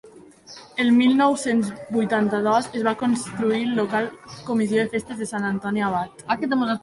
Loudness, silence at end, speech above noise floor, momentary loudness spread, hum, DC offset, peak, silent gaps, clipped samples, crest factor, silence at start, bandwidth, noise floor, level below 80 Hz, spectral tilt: -22 LUFS; 0.05 s; 24 dB; 10 LU; none; under 0.1%; -8 dBFS; none; under 0.1%; 16 dB; 0.05 s; 11.5 kHz; -45 dBFS; -60 dBFS; -5 dB/octave